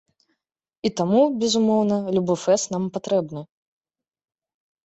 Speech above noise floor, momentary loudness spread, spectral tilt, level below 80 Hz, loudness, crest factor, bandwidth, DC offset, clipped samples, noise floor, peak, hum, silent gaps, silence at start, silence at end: 62 dB; 9 LU; -5.5 dB/octave; -64 dBFS; -22 LUFS; 16 dB; 8.2 kHz; under 0.1%; under 0.1%; -83 dBFS; -6 dBFS; none; none; 0.85 s; 1.4 s